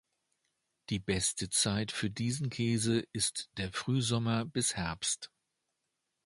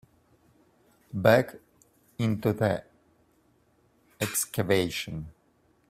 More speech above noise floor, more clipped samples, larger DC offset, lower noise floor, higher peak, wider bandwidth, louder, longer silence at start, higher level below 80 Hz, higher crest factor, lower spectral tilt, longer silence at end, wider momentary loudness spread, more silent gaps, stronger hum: first, 51 dB vs 40 dB; neither; neither; first, -84 dBFS vs -66 dBFS; second, -16 dBFS vs -6 dBFS; second, 11.5 kHz vs 16 kHz; second, -33 LUFS vs -27 LUFS; second, 0.9 s vs 1.15 s; about the same, -58 dBFS vs -60 dBFS; second, 18 dB vs 24 dB; second, -3.5 dB/octave vs -5 dB/octave; first, 1 s vs 0.6 s; second, 8 LU vs 17 LU; neither; neither